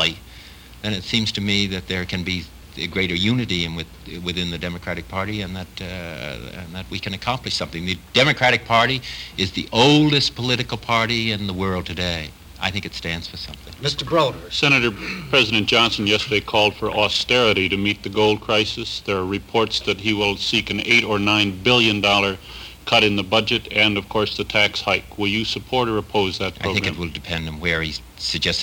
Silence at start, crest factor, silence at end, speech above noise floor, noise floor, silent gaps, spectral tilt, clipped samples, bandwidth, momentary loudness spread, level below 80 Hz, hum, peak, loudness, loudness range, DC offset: 0 s; 20 dB; 0 s; 21 dB; -42 dBFS; none; -4 dB/octave; under 0.1%; over 20 kHz; 13 LU; -44 dBFS; none; -2 dBFS; -20 LUFS; 7 LU; under 0.1%